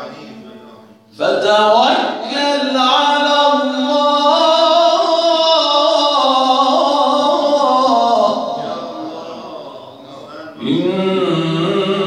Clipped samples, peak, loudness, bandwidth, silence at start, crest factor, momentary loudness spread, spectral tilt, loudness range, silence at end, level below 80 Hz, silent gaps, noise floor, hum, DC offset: under 0.1%; 0 dBFS; -13 LUFS; 11.5 kHz; 0 s; 14 dB; 17 LU; -4.5 dB/octave; 8 LU; 0 s; -70 dBFS; none; -41 dBFS; none; under 0.1%